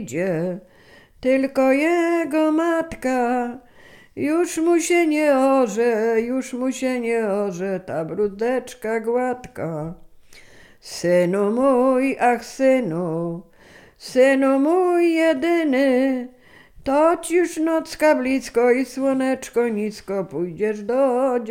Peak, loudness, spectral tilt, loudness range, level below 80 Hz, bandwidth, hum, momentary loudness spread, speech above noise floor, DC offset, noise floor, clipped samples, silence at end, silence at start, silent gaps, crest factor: -4 dBFS; -20 LUFS; -5.5 dB/octave; 5 LU; -56 dBFS; 16 kHz; none; 10 LU; 29 dB; under 0.1%; -48 dBFS; under 0.1%; 0 s; 0 s; none; 16 dB